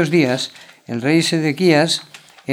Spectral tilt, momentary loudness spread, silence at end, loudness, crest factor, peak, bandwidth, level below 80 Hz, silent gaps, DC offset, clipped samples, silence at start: -5 dB/octave; 13 LU; 0 s; -17 LUFS; 18 dB; 0 dBFS; 16 kHz; -70 dBFS; none; under 0.1%; under 0.1%; 0 s